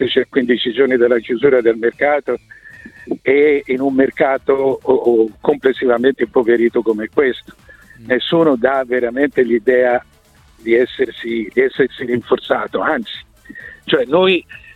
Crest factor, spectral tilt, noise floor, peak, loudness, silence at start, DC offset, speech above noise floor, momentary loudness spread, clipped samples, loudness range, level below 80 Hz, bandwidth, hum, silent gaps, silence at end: 16 dB; -7 dB/octave; -49 dBFS; 0 dBFS; -15 LUFS; 0 s; under 0.1%; 34 dB; 8 LU; under 0.1%; 3 LU; -52 dBFS; 4.7 kHz; none; none; 0.2 s